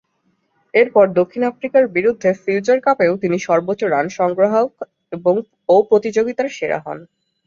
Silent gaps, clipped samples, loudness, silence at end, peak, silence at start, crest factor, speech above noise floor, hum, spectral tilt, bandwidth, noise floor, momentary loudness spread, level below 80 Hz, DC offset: none; under 0.1%; -17 LUFS; 0.45 s; -2 dBFS; 0.75 s; 16 dB; 49 dB; none; -6 dB/octave; 7.4 kHz; -65 dBFS; 9 LU; -62 dBFS; under 0.1%